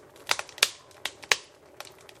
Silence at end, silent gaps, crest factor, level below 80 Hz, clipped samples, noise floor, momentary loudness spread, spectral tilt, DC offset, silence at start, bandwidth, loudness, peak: 0.3 s; none; 32 dB; -70 dBFS; under 0.1%; -48 dBFS; 20 LU; 1.5 dB/octave; under 0.1%; 0.2 s; 16 kHz; -28 LUFS; 0 dBFS